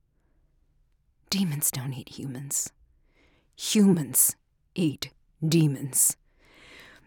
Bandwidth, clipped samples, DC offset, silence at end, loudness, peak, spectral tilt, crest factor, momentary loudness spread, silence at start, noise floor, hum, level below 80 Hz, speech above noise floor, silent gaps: 19.5 kHz; under 0.1%; under 0.1%; 0.25 s; -25 LUFS; -8 dBFS; -4 dB/octave; 20 dB; 16 LU; 1.3 s; -66 dBFS; none; -64 dBFS; 41 dB; none